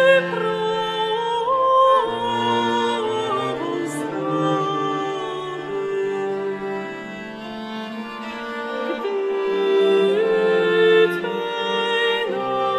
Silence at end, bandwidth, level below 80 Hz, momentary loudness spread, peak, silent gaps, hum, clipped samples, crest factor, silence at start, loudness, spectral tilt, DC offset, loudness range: 0 s; 13 kHz; -62 dBFS; 14 LU; -4 dBFS; none; none; under 0.1%; 18 dB; 0 s; -21 LUFS; -5 dB/octave; under 0.1%; 9 LU